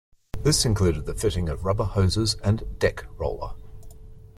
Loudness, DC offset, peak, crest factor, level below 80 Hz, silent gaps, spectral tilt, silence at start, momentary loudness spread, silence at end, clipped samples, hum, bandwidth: -25 LUFS; under 0.1%; -8 dBFS; 18 dB; -36 dBFS; none; -5 dB/octave; 0.35 s; 10 LU; 0.1 s; under 0.1%; none; 14 kHz